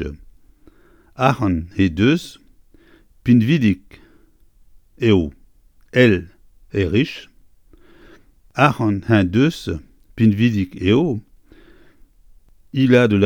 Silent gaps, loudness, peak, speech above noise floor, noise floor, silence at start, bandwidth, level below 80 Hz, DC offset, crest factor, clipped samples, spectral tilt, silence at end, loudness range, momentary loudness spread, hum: none; -18 LUFS; 0 dBFS; 35 dB; -51 dBFS; 0 s; 16 kHz; -44 dBFS; under 0.1%; 18 dB; under 0.1%; -7.5 dB/octave; 0 s; 3 LU; 13 LU; none